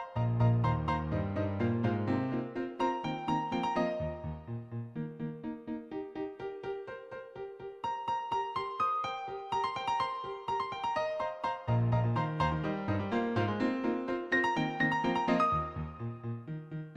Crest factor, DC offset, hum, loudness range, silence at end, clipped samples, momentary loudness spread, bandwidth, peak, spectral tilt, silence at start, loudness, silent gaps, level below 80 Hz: 16 dB; under 0.1%; none; 9 LU; 0 s; under 0.1%; 12 LU; 8.2 kHz; -16 dBFS; -7.5 dB/octave; 0 s; -33 LUFS; none; -52 dBFS